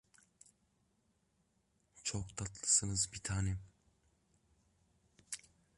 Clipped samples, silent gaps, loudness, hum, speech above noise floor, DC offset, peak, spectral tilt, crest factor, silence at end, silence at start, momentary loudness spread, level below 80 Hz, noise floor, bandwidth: under 0.1%; none; -36 LUFS; none; 41 dB; under 0.1%; -18 dBFS; -2.5 dB/octave; 24 dB; 0.4 s; 1.95 s; 17 LU; -58 dBFS; -78 dBFS; 11.5 kHz